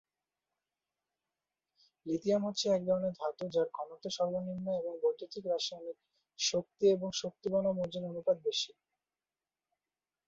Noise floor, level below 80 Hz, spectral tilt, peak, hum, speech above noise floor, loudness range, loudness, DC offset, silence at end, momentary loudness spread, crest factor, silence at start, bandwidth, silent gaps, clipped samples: under -90 dBFS; -74 dBFS; -4.5 dB/octave; -18 dBFS; none; over 56 dB; 3 LU; -34 LUFS; under 0.1%; 1.6 s; 10 LU; 18 dB; 2.05 s; 7.6 kHz; none; under 0.1%